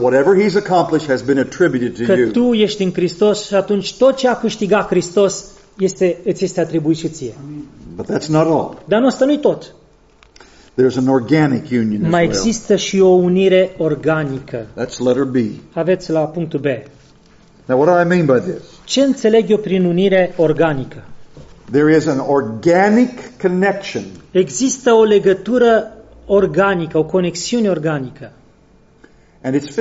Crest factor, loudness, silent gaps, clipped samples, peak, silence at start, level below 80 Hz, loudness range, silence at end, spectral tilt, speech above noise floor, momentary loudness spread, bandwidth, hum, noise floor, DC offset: 14 dB; -15 LUFS; none; under 0.1%; -2 dBFS; 0 s; -48 dBFS; 4 LU; 0 s; -5.5 dB/octave; 34 dB; 11 LU; 8 kHz; none; -49 dBFS; under 0.1%